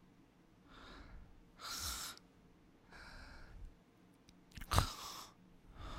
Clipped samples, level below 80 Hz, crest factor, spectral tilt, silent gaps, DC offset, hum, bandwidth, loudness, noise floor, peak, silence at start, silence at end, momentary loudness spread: under 0.1%; -52 dBFS; 34 dB; -3 dB/octave; none; under 0.1%; none; 16 kHz; -43 LUFS; -67 dBFS; -12 dBFS; 0 s; 0 s; 27 LU